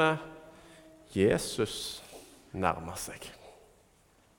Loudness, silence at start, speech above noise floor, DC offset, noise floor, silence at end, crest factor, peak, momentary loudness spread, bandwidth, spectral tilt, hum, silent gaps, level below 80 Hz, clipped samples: -32 LUFS; 0 s; 34 dB; under 0.1%; -64 dBFS; 0.85 s; 24 dB; -10 dBFS; 25 LU; 18 kHz; -4.5 dB/octave; none; none; -58 dBFS; under 0.1%